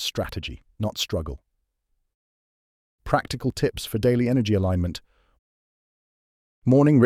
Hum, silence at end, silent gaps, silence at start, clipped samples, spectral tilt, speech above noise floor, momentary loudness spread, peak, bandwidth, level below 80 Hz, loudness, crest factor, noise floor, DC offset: none; 0 s; 2.14-2.98 s, 5.39-6.62 s; 0 s; under 0.1%; -6.5 dB/octave; 52 dB; 16 LU; -6 dBFS; 16 kHz; -44 dBFS; -24 LUFS; 20 dB; -74 dBFS; under 0.1%